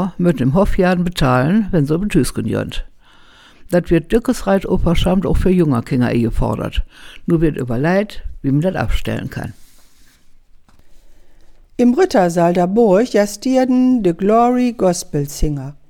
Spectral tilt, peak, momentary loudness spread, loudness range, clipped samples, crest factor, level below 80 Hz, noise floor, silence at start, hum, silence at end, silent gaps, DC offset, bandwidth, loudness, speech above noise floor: -6.5 dB/octave; -2 dBFS; 10 LU; 7 LU; under 0.1%; 14 dB; -28 dBFS; -45 dBFS; 0 s; none; 0.15 s; none; under 0.1%; 17 kHz; -16 LUFS; 30 dB